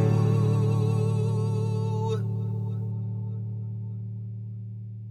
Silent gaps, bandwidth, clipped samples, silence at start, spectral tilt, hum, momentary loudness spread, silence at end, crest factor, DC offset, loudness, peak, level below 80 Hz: none; 8.6 kHz; under 0.1%; 0 s; -9 dB/octave; none; 14 LU; 0 s; 14 dB; under 0.1%; -28 LUFS; -12 dBFS; -62 dBFS